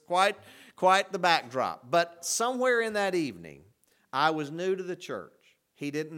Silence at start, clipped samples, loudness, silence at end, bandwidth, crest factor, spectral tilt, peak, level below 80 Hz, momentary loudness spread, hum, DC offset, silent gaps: 0.1 s; under 0.1%; -28 LUFS; 0 s; 18 kHz; 22 dB; -3 dB/octave; -8 dBFS; -76 dBFS; 13 LU; none; under 0.1%; none